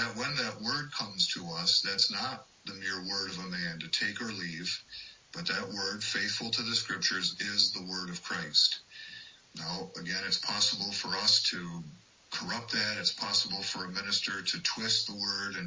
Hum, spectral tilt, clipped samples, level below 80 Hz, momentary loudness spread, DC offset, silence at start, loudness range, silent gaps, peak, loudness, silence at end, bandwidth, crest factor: none; -1.5 dB/octave; under 0.1%; -70 dBFS; 13 LU; under 0.1%; 0 s; 5 LU; none; -10 dBFS; -30 LUFS; 0 s; 7.8 kHz; 22 dB